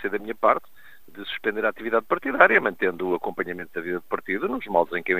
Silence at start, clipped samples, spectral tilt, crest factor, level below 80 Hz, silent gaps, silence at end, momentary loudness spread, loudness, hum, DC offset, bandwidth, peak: 0 s; under 0.1%; -6.5 dB/octave; 24 dB; -60 dBFS; none; 0 s; 13 LU; -24 LUFS; none; 0.6%; 15.5 kHz; 0 dBFS